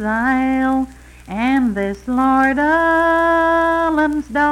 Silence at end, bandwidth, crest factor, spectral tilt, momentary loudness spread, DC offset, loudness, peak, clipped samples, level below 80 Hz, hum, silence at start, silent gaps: 0 s; 12.5 kHz; 12 dB; -6 dB/octave; 7 LU; under 0.1%; -16 LUFS; -4 dBFS; under 0.1%; -40 dBFS; none; 0 s; none